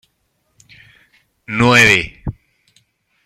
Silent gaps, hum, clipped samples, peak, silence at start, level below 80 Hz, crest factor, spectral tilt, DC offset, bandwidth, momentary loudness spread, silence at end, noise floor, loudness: none; none; under 0.1%; 0 dBFS; 1.5 s; -42 dBFS; 18 dB; -4 dB/octave; under 0.1%; 16 kHz; 21 LU; 0.95 s; -66 dBFS; -12 LUFS